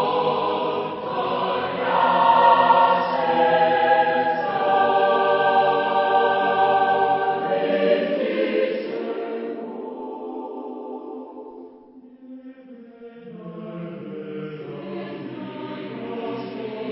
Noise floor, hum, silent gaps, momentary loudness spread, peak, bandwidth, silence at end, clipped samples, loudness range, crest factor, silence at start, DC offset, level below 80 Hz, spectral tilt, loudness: -46 dBFS; none; none; 17 LU; -2 dBFS; 5.8 kHz; 0 s; under 0.1%; 19 LU; 20 dB; 0 s; under 0.1%; -66 dBFS; -9.5 dB/octave; -20 LUFS